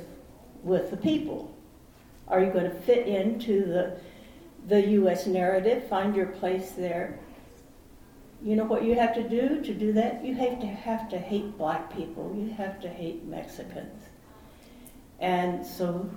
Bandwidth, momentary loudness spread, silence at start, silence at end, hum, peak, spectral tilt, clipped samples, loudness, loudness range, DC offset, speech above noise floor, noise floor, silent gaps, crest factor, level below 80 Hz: 18 kHz; 15 LU; 0 s; 0 s; none; -10 dBFS; -7 dB/octave; under 0.1%; -28 LUFS; 9 LU; under 0.1%; 25 dB; -53 dBFS; none; 18 dB; -56 dBFS